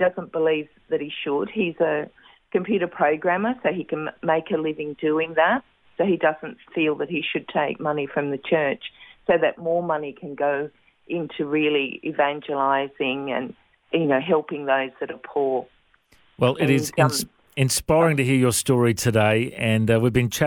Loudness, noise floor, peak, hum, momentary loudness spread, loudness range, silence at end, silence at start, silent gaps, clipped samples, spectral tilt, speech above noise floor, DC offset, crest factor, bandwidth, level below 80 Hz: -23 LUFS; -59 dBFS; -4 dBFS; none; 9 LU; 5 LU; 0 s; 0 s; none; under 0.1%; -5 dB/octave; 37 dB; under 0.1%; 20 dB; 16.5 kHz; -54 dBFS